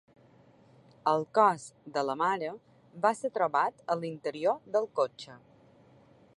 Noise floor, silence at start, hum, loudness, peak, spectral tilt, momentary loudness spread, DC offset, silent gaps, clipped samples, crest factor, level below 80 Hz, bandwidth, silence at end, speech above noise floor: -60 dBFS; 1.05 s; none; -30 LUFS; -10 dBFS; -5 dB/octave; 13 LU; under 0.1%; none; under 0.1%; 22 dB; -80 dBFS; 11.5 kHz; 1 s; 30 dB